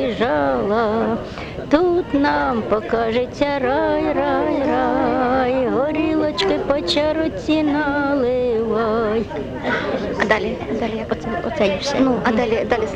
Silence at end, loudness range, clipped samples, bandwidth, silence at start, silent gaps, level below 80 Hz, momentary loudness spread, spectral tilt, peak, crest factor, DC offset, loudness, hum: 0 s; 2 LU; under 0.1%; 9.4 kHz; 0 s; none; -40 dBFS; 5 LU; -6 dB/octave; -2 dBFS; 16 dB; under 0.1%; -19 LUFS; none